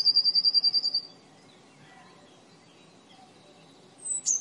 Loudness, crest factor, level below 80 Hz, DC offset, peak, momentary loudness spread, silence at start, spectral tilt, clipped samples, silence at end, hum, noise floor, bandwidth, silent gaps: -23 LUFS; 16 dB; -86 dBFS; under 0.1%; -14 dBFS; 17 LU; 0 s; 1.5 dB/octave; under 0.1%; 0 s; none; -55 dBFS; 11.5 kHz; none